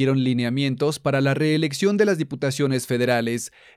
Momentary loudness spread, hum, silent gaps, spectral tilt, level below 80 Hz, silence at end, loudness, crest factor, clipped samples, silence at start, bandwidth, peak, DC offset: 4 LU; none; none; -5.5 dB/octave; -64 dBFS; 0.3 s; -22 LUFS; 16 dB; under 0.1%; 0 s; 15.5 kHz; -6 dBFS; under 0.1%